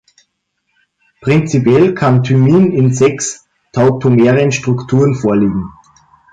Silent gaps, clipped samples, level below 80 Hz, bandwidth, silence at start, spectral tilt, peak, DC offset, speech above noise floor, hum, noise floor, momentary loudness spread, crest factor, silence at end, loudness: none; under 0.1%; -46 dBFS; 9.2 kHz; 1.25 s; -7 dB/octave; -2 dBFS; under 0.1%; 57 dB; none; -67 dBFS; 11 LU; 12 dB; 0.6 s; -12 LUFS